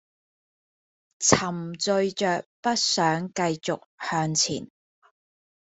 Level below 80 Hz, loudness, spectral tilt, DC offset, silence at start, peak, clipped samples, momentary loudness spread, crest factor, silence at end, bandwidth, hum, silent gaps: -62 dBFS; -25 LUFS; -3 dB/octave; under 0.1%; 1.2 s; -2 dBFS; under 0.1%; 9 LU; 26 dB; 0.95 s; 8.4 kHz; none; 2.46-2.63 s, 3.86-3.98 s